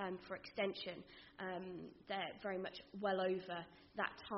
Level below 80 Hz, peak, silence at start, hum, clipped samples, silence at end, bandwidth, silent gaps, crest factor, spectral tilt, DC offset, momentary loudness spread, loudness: -76 dBFS; -24 dBFS; 0 s; none; under 0.1%; 0 s; 5.8 kHz; none; 22 dB; -3 dB/octave; under 0.1%; 12 LU; -45 LUFS